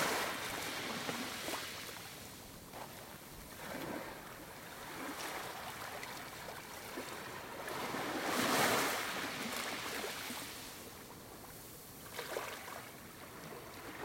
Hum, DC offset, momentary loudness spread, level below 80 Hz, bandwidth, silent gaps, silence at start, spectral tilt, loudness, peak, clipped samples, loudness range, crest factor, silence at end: none; under 0.1%; 15 LU; -68 dBFS; 16.5 kHz; none; 0 s; -2.5 dB/octave; -41 LUFS; -20 dBFS; under 0.1%; 10 LU; 22 dB; 0 s